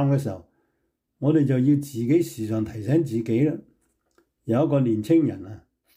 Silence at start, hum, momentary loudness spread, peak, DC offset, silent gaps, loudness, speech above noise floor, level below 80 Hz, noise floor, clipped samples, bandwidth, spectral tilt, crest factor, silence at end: 0 s; none; 15 LU; -10 dBFS; under 0.1%; none; -23 LUFS; 53 dB; -62 dBFS; -75 dBFS; under 0.1%; 16 kHz; -8.5 dB/octave; 14 dB; 0.35 s